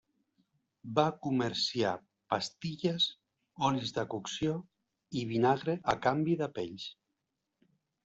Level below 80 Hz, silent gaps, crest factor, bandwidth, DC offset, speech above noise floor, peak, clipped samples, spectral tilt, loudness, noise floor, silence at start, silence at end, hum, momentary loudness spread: -68 dBFS; none; 22 dB; 8.2 kHz; under 0.1%; 53 dB; -12 dBFS; under 0.1%; -5 dB/octave; -33 LUFS; -85 dBFS; 0.85 s; 1.1 s; none; 11 LU